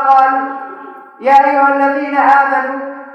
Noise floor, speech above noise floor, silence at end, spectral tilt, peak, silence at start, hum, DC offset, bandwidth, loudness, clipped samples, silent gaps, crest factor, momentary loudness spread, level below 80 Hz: -32 dBFS; 21 dB; 0 s; -4 dB/octave; 0 dBFS; 0 s; none; under 0.1%; 6.8 kHz; -11 LUFS; under 0.1%; none; 12 dB; 15 LU; -62 dBFS